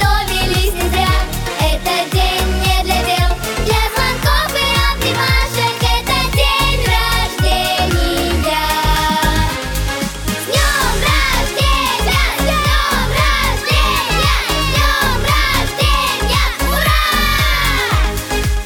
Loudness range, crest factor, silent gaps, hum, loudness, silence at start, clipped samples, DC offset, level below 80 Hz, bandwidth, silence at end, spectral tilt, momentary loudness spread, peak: 2 LU; 14 dB; none; none; -14 LUFS; 0 s; under 0.1%; under 0.1%; -20 dBFS; 19 kHz; 0 s; -3.5 dB/octave; 4 LU; 0 dBFS